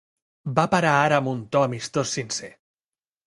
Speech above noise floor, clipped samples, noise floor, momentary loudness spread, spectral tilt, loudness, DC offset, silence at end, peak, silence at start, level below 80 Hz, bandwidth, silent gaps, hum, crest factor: over 68 dB; under 0.1%; under -90 dBFS; 12 LU; -4.5 dB/octave; -23 LUFS; under 0.1%; 0.8 s; -2 dBFS; 0.45 s; -62 dBFS; 11.5 kHz; none; none; 22 dB